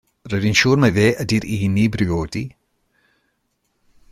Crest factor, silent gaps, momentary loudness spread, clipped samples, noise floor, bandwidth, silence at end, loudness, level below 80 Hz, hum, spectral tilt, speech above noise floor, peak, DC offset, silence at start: 18 dB; none; 12 LU; under 0.1%; -70 dBFS; 15 kHz; 1.65 s; -18 LUFS; -44 dBFS; none; -5.5 dB/octave; 52 dB; -2 dBFS; under 0.1%; 0.25 s